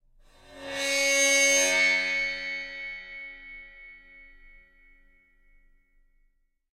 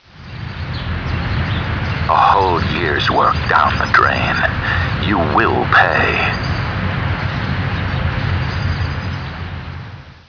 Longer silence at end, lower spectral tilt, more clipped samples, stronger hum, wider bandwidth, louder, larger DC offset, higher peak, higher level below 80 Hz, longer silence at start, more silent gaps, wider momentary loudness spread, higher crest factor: first, 2.5 s vs 0.1 s; second, 1 dB/octave vs -6.5 dB/octave; neither; neither; first, 16 kHz vs 5.4 kHz; second, -23 LUFS vs -16 LUFS; neither; second, -12 dBFS vs 0 dBFS; second, -58 dBFS vs -30 dBFS; first, 0.5 s vs 0.15 s; neither; first, 24 LU vs 14 LU; about the same, 18 dB vs 16 dB